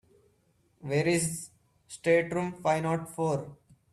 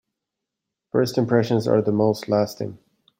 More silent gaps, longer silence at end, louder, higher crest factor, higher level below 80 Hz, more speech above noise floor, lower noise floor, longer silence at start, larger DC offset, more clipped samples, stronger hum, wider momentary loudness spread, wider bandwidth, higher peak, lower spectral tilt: neither; about the same, 0.4 s vs 0.45 s; second, -29 LUFS vs -21 LUFS; about the same, 18 dB vs 18 dB; about the same, -66 dBFS vs -62 dBFS; second, 40 dB vs 63 dB; second, -69 dBFS vs -84 dBFS; second, 0.8 s vs 0.95 s; neither; neither; neither; first, 19 LU vs 7 LU; second, 14.5 kHz vs 16.5 kHz; second, -12 dBFS vs -4 dBFS; second, -5 dB/octave vs -7 dB/octave